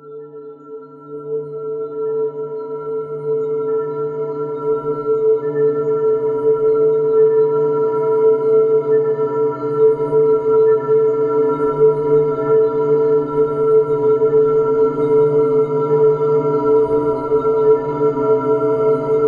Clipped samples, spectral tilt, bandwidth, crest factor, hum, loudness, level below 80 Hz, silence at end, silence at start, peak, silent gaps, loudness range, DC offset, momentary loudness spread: under 0.1%; -10 dB/octave; 3.2 kHz; 12 dB; none; -16 LUFS; -54 dBFS; 0 s; 0.05 s; -4 dBFS; none; 7 LU; under 0.1%; 11 LU